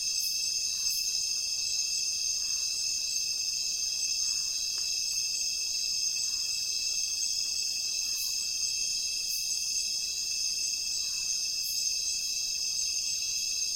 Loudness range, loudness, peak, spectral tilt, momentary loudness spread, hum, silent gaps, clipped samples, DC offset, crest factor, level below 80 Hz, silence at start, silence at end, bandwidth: 1 LU; -28 LUFS; -16 dBFS; 3.5 dB/octave; 1 LU; none; none; under 0.1%; under 0.1%; 14 dB; -62 dBFS; 0 s; 0 s; 17 kHz